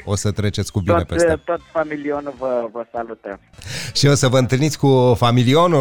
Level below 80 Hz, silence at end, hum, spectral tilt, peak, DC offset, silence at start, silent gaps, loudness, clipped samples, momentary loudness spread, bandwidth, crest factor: -42 dBFS; 0 s; none; -5.5 dB/octave; -6 dBFS; under 0.1%; 0 s; none; -18 LUFS; under 0.1%; 14 LU; 18 kHz; 12 dB